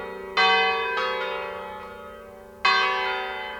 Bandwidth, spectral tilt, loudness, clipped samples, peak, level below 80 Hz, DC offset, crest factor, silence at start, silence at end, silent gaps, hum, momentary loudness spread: over 20 kHz; -2 dB/octave; -23 LUFS; under 0.1%; -6 dBFS; -58 dBFS; under 0.1%; 18 dB; 0 s; 0 s; none; none; 21 LU